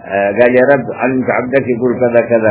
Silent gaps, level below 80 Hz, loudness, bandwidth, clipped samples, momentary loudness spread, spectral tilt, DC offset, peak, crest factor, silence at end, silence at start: none; -48 dBFS; -12 LUFS; 4 kHz; 0.3%; 5 LU; -11 dB/octave; under 0.1%; 0 dBFS; 12 dB; 0 s; 0.05 s